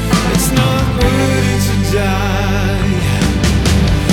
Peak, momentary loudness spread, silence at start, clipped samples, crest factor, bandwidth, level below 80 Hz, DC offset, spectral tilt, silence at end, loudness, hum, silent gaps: -2 dBFS; 3 LU; 0 s; under 0.1%; 10 dB; 18 kHz; -20 dBFS; under 0.1%; -5.5 dB/octave; 0 s; -14 LUFS; 50 Hz at -30 dBFS; none